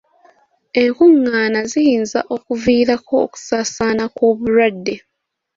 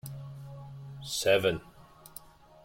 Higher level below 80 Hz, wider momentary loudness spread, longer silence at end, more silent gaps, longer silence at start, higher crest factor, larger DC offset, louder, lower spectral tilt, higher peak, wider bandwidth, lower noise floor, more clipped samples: first, -52 dBFS vs -60 dBFS; second, 10 LU vs 23 LU; first, 0.6 s vs 0.05 s; neither; first, 0.75 s vs 0.05 s; second, 14 dB vs 22 dB; neither; first, -16 LUFS vs -28 LUFS; about the same, -4.5 dB/octave vs -3.5 dB/octave; first, -2 dBFS vs -12 dBFS; second, 7.8 kHz vs 16.5 kHz; first, -75 dBFS vs -52 dBFS; neither